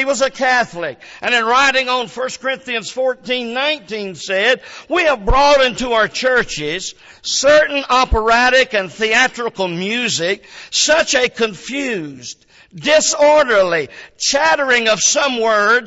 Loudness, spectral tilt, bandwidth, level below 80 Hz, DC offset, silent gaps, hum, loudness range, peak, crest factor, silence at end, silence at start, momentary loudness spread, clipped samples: -15 LUFS; -2 dB/octave; 8 kHz; -34 dBFS; under 0.1%; none; none; 3 LU; -2 dBFS; 14 dB; 0 s; 0 s; 11 LU; under 0.1%